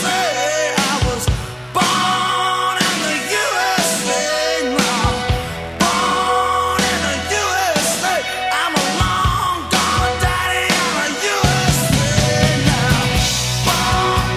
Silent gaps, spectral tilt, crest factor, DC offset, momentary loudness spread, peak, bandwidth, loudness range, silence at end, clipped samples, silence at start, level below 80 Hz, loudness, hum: none; -3.5 dB/octave; 16 dB; under 0.1%; 3 LU; 0 dBFS; 16 kHz; 2 LU; 0 s; under 0.1%; 0 s; -30 dBFS; -16 LUFS; none